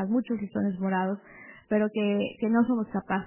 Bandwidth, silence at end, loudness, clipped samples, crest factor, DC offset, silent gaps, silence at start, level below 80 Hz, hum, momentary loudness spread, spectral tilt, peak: 3.2 kHz; 0 s; -28 LUFS; under 0.1%; 16 dB; under 0.1%; none; 0 s; -64 dBFS; none; 9 LU; -6 dB/octave; -12 dBFS